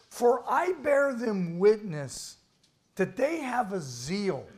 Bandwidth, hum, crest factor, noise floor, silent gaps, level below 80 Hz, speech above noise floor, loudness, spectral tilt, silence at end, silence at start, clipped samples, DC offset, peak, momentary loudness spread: 15.5 kHz; none; 16 dB; -68 dBFS; none; -66 dBFS; 40 dB; -28 LUFS; -5.5 dB/octave; 0 s; 0.1 s; under 0.1%; under 0.1%; -12 dBFS; 12 LU